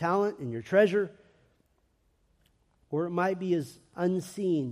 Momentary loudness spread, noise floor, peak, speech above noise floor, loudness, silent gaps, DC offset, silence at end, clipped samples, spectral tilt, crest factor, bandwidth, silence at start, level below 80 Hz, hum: 12 LU; -70 dBFS; -12 dBFS; 42 dB; -29 LUFS; none; under 0.1%; 0 s; under 0.1%; -7 dB/octave; 18 dB; 15 kHz; 0 s; -72 dBFS; none